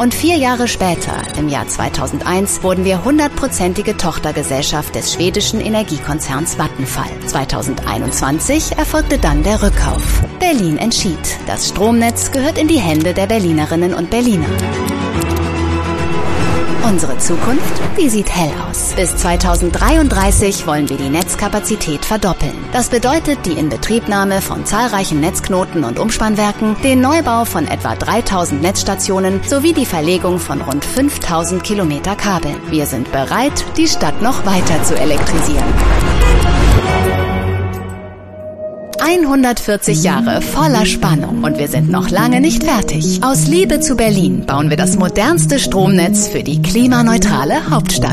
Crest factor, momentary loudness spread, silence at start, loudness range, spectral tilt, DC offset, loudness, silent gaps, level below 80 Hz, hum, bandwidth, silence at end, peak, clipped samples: 14 dB; 6 LU; 0 s; 4 LU; -4.5 dB/octave; under 0.1%; -14 LUFS; none; -22 dBFS; none; 14.5 kHz; 0 s; 0 dBFS; under 0.1%